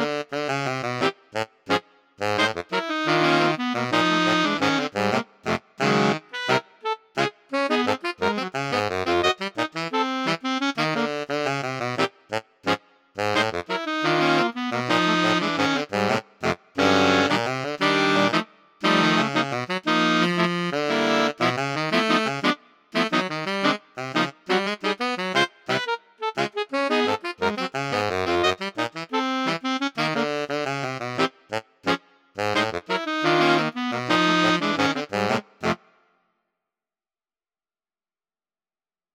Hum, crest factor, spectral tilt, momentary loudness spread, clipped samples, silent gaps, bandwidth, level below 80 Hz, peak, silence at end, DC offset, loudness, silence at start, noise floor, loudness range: none; 20 dB; -4.5 dB/octave; 8 LU; under 0.1%; none; 16 kHz; -64 dBFS; -6 dBFS; 3.4 s; under 0.1%; -23 LUFS; 0 s; under -90 dBFS; 4 LU